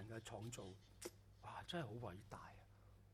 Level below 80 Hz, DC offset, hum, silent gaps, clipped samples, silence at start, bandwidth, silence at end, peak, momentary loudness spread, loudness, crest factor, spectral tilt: -70 dBFS; under 0.1%; none; none; under 0.1%; 0 s; 15.5 kHz; 0 s; -36 dBFS; 15 LU; -54 LUFS; 20 dB; -4.5 dB/octave